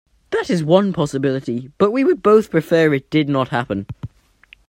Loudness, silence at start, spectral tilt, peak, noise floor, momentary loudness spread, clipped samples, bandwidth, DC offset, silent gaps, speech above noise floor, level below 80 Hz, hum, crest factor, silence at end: -18 LUFS; 0.3 s; -7 dB/octave; 0 dBFS; -50 dBFS; 12 LU; under 0.1%; 16 kHz; under 0.1%; none; 34 dB; -52 dBFS; none; 18 dB; 0.6 s